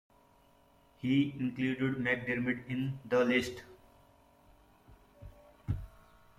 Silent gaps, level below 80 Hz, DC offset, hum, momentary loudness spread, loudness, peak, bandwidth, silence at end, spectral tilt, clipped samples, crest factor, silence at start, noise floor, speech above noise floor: none; -58 dBFS; under 0.1%; none; 20 LU; -33 LUFS; -18 dBFS; 14.5 kHz; 0.5 s; -6.5 dB/octave; under 0.1%; 18 dB; 1.05 s; -65 dBFS; 33 dB